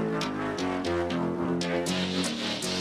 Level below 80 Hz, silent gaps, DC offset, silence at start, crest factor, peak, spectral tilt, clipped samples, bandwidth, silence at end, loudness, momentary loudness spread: -56 dBFS; none; under 0.1%; 0 s; 14 dB; -16 dBFS; -4.5 dB/octave; under 0.1%; 14.5 kHz; 0 s; -29 LUFS; 2 LU